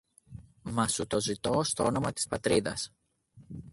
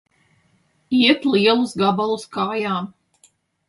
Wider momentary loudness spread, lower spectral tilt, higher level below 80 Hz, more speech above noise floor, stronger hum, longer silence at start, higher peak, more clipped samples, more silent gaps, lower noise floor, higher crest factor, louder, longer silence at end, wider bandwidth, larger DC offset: first, 17 LU vs 9 LU; second, -4 dB/octave vs -5.5 dB/octave; first, -56 dBFS vs -66 dBFS; second, 29 dB vs 43 dB; neither; second, 0.3 s vs 0.9 s; second, -12 dBFS vs -4 dBFS; neither; neither; about the same, -59 dBFS vs -62 dBFS; about the same, 20 dB vs 18 dB; second, -30 LUFS vs -19 LUFS; second, 0 s vs 0.8 s; about the same, 12 kHz vs 11.5 kHz; neither